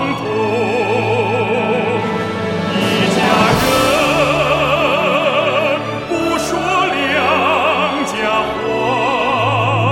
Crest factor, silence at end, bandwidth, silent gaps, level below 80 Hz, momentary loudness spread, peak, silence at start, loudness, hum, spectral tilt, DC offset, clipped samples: 14 dB; 0 s; 16.5 kHz; none; -42 dBFS; 5 LU; -2 dBFS; 0 s; -15 LUFS; none; -5 dB/octave; under 0.1%; under 0.1%